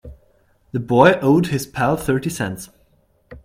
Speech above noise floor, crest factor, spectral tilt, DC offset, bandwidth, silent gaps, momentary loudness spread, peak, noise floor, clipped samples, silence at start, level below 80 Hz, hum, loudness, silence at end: 42 dB; 20 dB; -6 dB/octave; under 0.1%; 16.5 kHz; none; 16 LU; 0 dBFS; -59 dBFS; under 0.1%; 0.05 s; -46 dBFS; none; -18 LUFS; 0.1 s